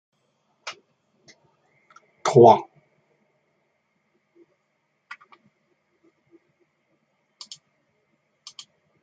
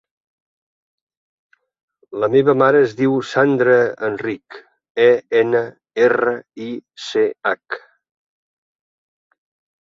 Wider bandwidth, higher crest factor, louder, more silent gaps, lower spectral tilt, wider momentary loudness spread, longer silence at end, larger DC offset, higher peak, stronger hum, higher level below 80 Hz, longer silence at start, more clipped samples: first, 9.2 kHz vs 7.6 kHz; first, 26 dB vs 18 dB; about the same, -17 LUFS vs -17 LUFS; second, none vs 4.90-4.95 s; about the same, -6.5 dB/octave vs -6.5 dB/octave; first, 31 LU vs 16 LU; first, 6.4 s vs 2 s; neither; about the same, -2 dBFS vs -2 dBFS; neither; second, -74 dBFS vs -64 dBFS; second, 0.65 s vs 2.1 s; neither